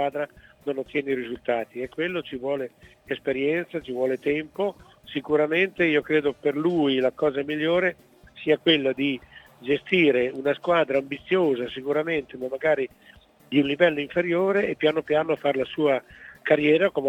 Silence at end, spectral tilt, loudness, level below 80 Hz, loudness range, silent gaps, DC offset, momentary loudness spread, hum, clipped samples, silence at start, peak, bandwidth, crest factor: 0 s; -7 dB/octave; -24 LUFS; -62 dBFS; 5 LU; none; under 0.1%; 11 LU; none; under 0.1%; 0 s; -4 dBFS; 9 kHz; 20 dB